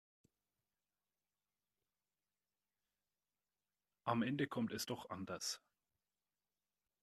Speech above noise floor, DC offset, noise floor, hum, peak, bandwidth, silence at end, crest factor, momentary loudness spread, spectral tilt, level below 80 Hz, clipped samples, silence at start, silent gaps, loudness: over 48 dB; under 0.1%; under -90 dBFS; 50 Hz at -80 dBFS; -22 dBFS; 13 kHz; 1.45 s; 26 dB; 8 LU; -4.5 dB/octave; -84 dBFS; under 0.1%; 4.05 s; none; -43 LUFS